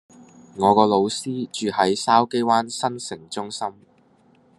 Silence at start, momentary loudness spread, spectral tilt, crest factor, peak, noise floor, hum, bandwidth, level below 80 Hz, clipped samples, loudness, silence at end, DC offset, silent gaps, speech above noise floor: 0.2 s; 14 LU; -4.5 dB/octave; 20 dB; -2 dBFS; -57 dBFS; none; 12.5 kHz; -68 dBFS; under 0.1%; -21 LUFS; 0.85 s; under 0.1%; none; 36 dB